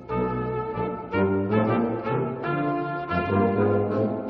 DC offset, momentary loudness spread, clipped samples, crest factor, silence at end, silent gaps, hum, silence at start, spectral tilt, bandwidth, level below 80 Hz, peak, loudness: under 0.1%; 6 LU; under 0.1%; 16 dB; 0 s; none; none; 0 s; -7.5 dB/octave; 5.6 kHz; -50 dBFS; -8 dBFS; -25 LUFS